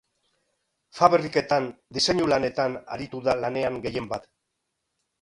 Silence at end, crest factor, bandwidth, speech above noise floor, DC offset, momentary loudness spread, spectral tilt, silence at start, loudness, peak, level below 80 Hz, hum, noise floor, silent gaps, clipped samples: 1 s; 24 dB; 11.5 kHz; 55 dB; under 0.1%; 13 LU; -4.5 dB/octave; 0.95 s; -25 LUFS; -2 dBFS; -58 dBFS; none; -79 dBFS; none; under 0.1%